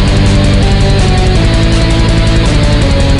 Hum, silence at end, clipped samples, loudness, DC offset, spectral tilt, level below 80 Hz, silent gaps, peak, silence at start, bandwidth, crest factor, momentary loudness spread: none; 0 s; under 0.1%; -9 LUFS; 2%; -6 dB/octave; -10 dBFS; none; 0 dBFS; 0 s; 11 kHz; 8 dB; 1 LU